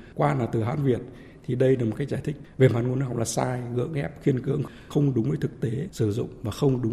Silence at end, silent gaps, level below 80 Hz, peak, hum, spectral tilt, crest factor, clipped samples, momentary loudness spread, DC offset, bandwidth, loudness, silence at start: 0 s; none; -52 dBFS; -6 dBFS; none; -7 dB/octave; 20 dB; under 0.1%; 8 LU; under 0.1%; 13.5 kHz; -26 LUFS; 0 s